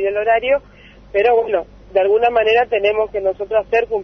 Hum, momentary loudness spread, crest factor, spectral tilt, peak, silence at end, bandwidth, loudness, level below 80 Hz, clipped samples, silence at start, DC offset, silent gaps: 50 Hz at -45 dBFS; 7 LU; 14 dB; -5.5 dB/octave; -4 dBFS; 0 s; 6.2 kHz; -17 LUFS; -46 dBFS; under 0.1%; 0 s; under 0.1%; none